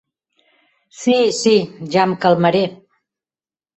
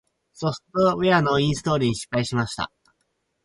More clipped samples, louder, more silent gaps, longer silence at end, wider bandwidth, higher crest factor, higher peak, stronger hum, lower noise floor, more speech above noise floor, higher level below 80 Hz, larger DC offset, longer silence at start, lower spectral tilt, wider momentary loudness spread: neither; first, -16 LUFS vs -23 LUFS; neither; first, 1.05 s vs 0.8 s; second, 8.4 kHz vs 11.5 kHz; about the same, 16 dB vs 18 dB; first, -2 dBFS vs -6 dBFS; neither; first, under -90 dBFS vs -73 dBFS; first, over 75 dB vs 51 dB; second, -60 dBFS vs -52 dBFS; neither; first, 1 s vs 0.4 s; about the same, -5 dB/octave vs -5.5 dB/octave; second, 6 LU vs 10 LU